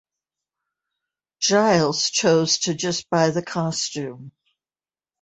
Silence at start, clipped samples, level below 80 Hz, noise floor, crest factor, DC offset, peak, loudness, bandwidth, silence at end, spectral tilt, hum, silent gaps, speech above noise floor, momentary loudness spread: 1.4 s; under 0.1%; -64 dBFS; under -90 dBFS; 20 dB; under 0.1%; -4 dBFS; -20 LUFS; 8.4 kHz; 0.95 s; -3.5 dB/octave; none; none; over 69 dB; 8 LU